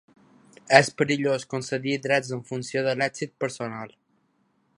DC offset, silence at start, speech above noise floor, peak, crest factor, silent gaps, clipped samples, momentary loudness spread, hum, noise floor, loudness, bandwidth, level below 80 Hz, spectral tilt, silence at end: under 0.1%; 0.65 s; 44 dB; 0 dBFS; 26 dB; none; under 0.1%; 14 LU; none; -69 dBFS; -25 LUFS; 11.5 kHz; -68 dBFS; -4.5 dB/octave; 0.9 s